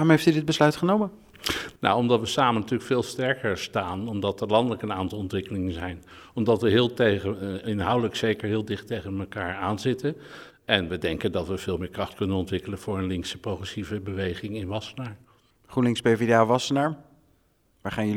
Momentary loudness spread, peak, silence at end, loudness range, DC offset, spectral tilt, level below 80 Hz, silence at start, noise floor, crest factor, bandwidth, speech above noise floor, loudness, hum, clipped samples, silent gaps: 12 LU; -2 dBFS; 0 s; 5 LU; under 0.1%; -5.5 dB/octave; -54 dBFS; 0 s; -65 dBFS; 24 dB; 16.5 kHz; 40 dB; -26 LUFS; none; under 0.1%; none